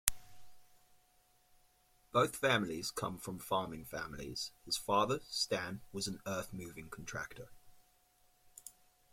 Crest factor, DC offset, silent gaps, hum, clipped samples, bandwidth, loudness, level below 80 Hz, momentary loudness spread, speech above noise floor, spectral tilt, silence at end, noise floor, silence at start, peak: 36 dB; under 0.1%; none; none; under 0.1%; 16.5 kHz; -38 LUFS; -62 dBFS; 16 LU; 33 dB; -3 dB/octave; 0.4 s; -71 dBFS; 0.05 s; -4 dBFS